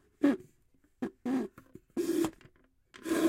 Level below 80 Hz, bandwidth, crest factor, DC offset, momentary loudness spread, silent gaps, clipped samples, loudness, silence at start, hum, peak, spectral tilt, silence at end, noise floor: -68 dBFS; 16 kHz; 20 dB; under 0.1%; 11 LU; none; under 0.1%; -35 LUFS; 0.2 s; none; -14 dBFS; -5 dB/octave; 0 s; -68 dBFS